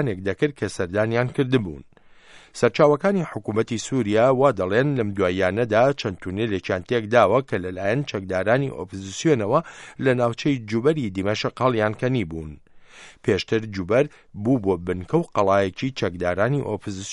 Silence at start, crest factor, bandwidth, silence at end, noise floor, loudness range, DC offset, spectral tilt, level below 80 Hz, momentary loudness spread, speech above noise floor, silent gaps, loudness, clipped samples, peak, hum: 0 s; 20 dB; 11.5 kHz; 0 s; -49 dBFS; 3 LU; under 0.1%; -6 dB/octave; -54 dBFS; 10 LU; 27 dB; none; -22 LUFS; under 0.1%; -2 dBFS; none